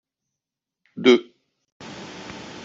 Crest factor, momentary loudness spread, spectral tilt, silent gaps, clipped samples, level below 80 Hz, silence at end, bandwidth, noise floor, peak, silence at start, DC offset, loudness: 22 dB; 24 LU; -4.5 dB/octave; 1.72-1.80 s; under 0.1%; -66 dBFS; 0 s; 7.6 kHz; -86 dBFS; -2 dBFS; 0.95 s; under 0.1%; -19 LUFS